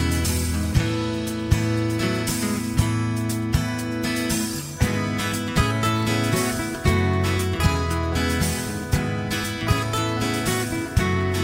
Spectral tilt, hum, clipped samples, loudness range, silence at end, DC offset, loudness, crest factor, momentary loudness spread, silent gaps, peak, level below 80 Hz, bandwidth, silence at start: -5 dB/octave; none; under 0.1%; 2 LU; 0 s; under 0.1%; -23 LUFS; 18 dB; 4 LU; none; -6 dBFS; -34 dBFS; 16.5 kHz; 0 s